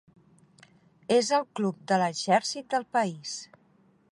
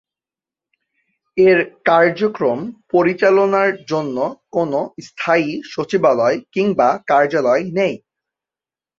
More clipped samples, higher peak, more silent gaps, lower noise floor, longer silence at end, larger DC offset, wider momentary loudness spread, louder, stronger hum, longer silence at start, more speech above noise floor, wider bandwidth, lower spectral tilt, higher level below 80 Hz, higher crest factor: neither; second, -10 dBFS vs -2 dBFS; neither; second, -63 dBFS vs under -90 dBFS; second, 0.7 s vs 1 s; neither; first, 13 LU vs 10 LU; second, -27 LUFS vs -17 LUFS; neither; second, 1.1 s vs 1.35 s; second, 36 dB vs over 74 dB; first, 11.5 kHz vs 7.4 kHz; second, -4 dB/octave vs -6.5 dB/octave; second, -76 dBFS vs -62 dBFS; about the same, 20 dB vs 16 dB